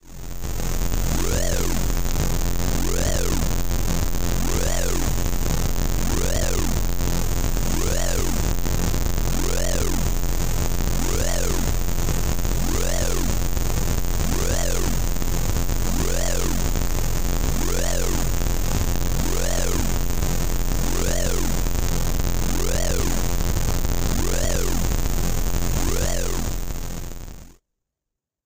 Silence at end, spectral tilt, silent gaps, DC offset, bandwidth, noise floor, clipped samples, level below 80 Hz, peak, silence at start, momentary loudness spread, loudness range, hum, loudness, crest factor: 0.95 s; -4.5 dB/octave; none; under 0.1%; 16.5 kHz; -85 dBFS; under 0.1%; -24 dBFS; -10 dBFS; 0.05 s; 2 LU; 0 LU; none; -25 LUFS; 12 dB